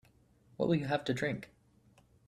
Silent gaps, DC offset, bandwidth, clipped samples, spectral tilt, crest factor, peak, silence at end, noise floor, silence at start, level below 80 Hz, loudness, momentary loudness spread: none; under 0.1%; 13.5 kHz; under 0.1%; -6.5 dB/octave; 20 dB; -18 dBFS; 0.85 s; -66 dBFS; 0.6 s; -66 dBFS; -34 LUFS; 11 LU